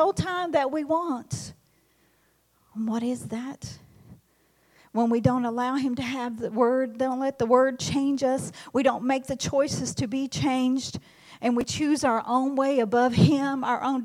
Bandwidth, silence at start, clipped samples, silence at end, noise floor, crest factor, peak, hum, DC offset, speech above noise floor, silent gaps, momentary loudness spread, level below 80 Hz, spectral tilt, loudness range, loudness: 14.5 kHz; 0 s; under 0.1%; 0 s; -66 dBFS; 20 dB; -6 dBFS; none; under 0.1%; 41 dB; none; 11 LU; -58 dBFS; -5.5 dB/octave; 8 LU; -25 LUFS